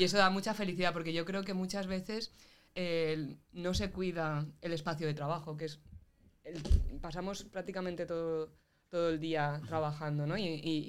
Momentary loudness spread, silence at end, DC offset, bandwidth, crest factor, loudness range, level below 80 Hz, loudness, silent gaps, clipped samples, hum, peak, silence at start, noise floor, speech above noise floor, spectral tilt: 9 LU; 0 s; 0.2%; 16 kHz; 22 dB; 3 LU; -44 dBFS; -36 LUFS; none; under 0.1%; none; -12 dBFS; 0 s; -60 dBFS; 25 dB; -5.5 dB/octave